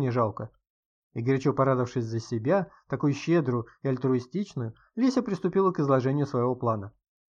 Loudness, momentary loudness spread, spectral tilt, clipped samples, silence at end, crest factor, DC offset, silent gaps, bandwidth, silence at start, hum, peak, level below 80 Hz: -27 LUFS; 10 LU; -8 dB/octave; under 0.1%; 0.4 s; 16 dB; under 0.1%; 0.70-1.10 s; 7.6 kHz; 0 s; none; -10 dBFS; -66 dBFS